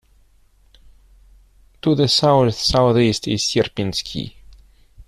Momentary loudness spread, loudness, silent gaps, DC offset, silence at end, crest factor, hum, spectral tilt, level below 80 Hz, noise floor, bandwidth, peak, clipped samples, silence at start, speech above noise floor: 12 LU; -18 LUFS; none; under 0.1%; 0.05 s; 18 dB; none; -5 dB/octave; -44 dBFS; -54 dBFS; 14 kHz; -4 dBFS; under 0.1%; 1.85 s; 37 dB